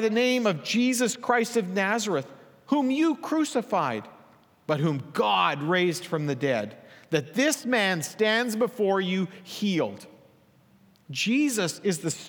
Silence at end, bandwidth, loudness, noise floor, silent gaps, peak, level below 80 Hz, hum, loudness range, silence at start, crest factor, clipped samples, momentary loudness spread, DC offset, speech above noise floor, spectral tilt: 0 s; over 20 kHz; -26 LUFS; -59 dBFS; none; -8 dBFS; -80 dBFS; none; 3 LU; 0 s; 18 dB; under 0.1%; 7 LU; under 0.1%; 34 dB; -4.5 dB/octave